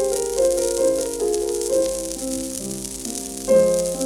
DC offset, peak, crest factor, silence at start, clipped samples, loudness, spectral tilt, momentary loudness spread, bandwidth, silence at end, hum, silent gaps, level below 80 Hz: under 0.1%; -4 dBFS; 16 dB; 0 s; under 0.1%; -21 LUFS; -3.5 dB/octave; 10 LU; 19.5 kHz; 0 s; none; none; -44 dBFS